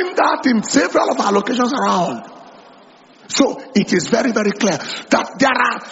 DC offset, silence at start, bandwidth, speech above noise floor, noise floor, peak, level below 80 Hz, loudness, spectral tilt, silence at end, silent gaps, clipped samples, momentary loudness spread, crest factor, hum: under 0.1%; 0 s; 8 kHz; 29 dB; -46 dBFS; 0 dBFS; -58 dBFS; -17 LUFS; -3 dB/octave; 0 s; none; under 0.1%; 4 LU; 16 dB; none